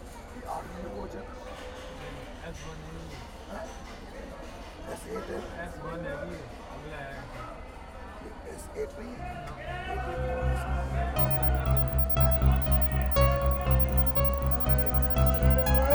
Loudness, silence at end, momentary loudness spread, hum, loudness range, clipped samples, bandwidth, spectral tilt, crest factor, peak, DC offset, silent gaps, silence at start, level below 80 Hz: -27 LUFS; 0 s; 19 LU; none; 17 LU; under 0.1%; over 20 kHz; -7 dB/octave; 18 dB; -10 dBFS; under 0.1%; none; 0 s; -32 dBFS